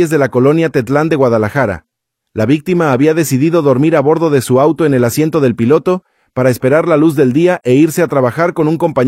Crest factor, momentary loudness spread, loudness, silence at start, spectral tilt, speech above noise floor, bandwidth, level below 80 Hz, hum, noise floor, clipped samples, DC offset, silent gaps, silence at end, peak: 12 dB; 4 LU; -12 LUFS; 0 s; -7 dB/octave; 33 dB; 16 kHz; -50 dBFS; none; -43 dBFS; under 0.1%; under 0.1%; none; 0 s; 0 dBFS